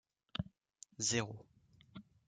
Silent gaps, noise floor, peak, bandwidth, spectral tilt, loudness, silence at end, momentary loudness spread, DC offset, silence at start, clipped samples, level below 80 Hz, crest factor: none; -64 dBFS; -24 dBFS; 10.5 kHz; -3 dB/octave; -40 LUFS; 0.25 s; 22 LU; under 0.1%; 0.4 s; under 0.1%; -68 dBFS; 22 dB